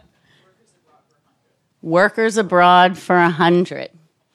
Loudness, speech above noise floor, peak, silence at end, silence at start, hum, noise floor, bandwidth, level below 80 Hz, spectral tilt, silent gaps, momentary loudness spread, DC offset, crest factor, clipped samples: -15 LUFS; 51 dB; -2 dBFS; 0.45 s; 1.85 s; none; -65 dBFS; 12.5 kHz; -68 dBFS; -5.5 dB/octave; none; 18 LU; under 0.1%; 16 dB; under 0.1%